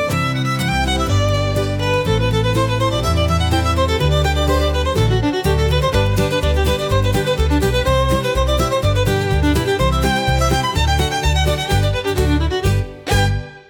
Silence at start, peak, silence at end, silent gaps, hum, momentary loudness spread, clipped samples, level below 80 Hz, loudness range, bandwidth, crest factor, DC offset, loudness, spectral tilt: 0 s; -4 dBFS; 0.1 s; none; none; 2 LU; under 0.1%; -24 dBFS; 1 LU; 18 kHz; 12 dB; under 0.1%; -17 LUFS; -5.5 dB/octave